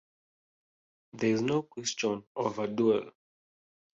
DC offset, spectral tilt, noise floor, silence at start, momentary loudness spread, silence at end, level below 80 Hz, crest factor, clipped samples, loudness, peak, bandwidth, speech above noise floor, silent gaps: under 0.1%; -4.5 dB/octave; under -90 dBFS; 1.15 s; 6 LU; 0.9 s; -72 dBFS; 18 dB; under 0.1%; -31 LUFS; -14 dBFS; 8.2 kHz; over 60 dB; 2.27-2.35 s